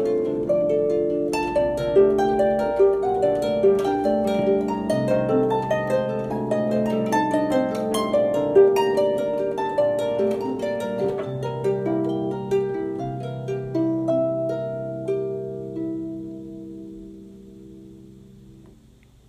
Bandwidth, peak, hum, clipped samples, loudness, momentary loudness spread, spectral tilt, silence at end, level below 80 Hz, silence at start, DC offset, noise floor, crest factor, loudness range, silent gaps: 14.5 kHz; -6 dBFS; none; under 0.1%; -22 LUFS; 11 LU; -7 dB/octave; 0.6 s; -52 dBFS; 0 s; under 0.1%; -52 dBFS; 18 dB; 11 LU; none